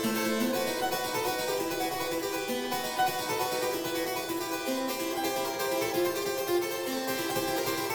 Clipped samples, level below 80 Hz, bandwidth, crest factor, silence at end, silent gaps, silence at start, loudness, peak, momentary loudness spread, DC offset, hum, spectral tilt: under 0.1%; -64 dBFS; over 20 kHz; 14 dB; 0 s; none; 0 s; -30 LUFS; -16 dBFS; 3 LU; under 0.1%; none; -3 dB/octave